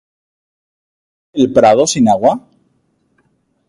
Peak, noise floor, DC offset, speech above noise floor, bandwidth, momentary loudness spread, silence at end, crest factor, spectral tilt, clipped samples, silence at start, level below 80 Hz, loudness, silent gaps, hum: 0 dBFS; -61 dBFS; under 0.1%; 50 dB; 11.5 kHz; 13 LU; 1.3 s; 16 dB; -4.5 dB/octave; under 0.1%; 1.35 s; -52 dBFS; -11 LUFS; none; none